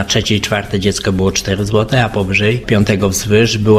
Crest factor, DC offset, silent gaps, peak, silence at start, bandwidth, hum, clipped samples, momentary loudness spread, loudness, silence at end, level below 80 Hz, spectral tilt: 14 dB; under 0.1%; none; 0 dBFS; 0 s; 16 kHz; none; under 0.1%; 3 LU; -14 LUFS; 0 s; -32 dBFS; -4.5 dB/octave